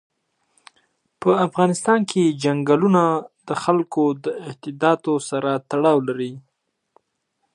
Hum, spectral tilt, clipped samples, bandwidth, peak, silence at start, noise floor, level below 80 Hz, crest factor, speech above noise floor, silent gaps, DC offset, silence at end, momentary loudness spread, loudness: none; -6 dB/octave; under 0.1%; 11.5 kHz; -2 dBFS; 1.2 s; -73 dBFS; -70 dBFS; 18 dB; 54 dB; none; under 0.1%; 1.15 s; 11 LU; -20 LUFS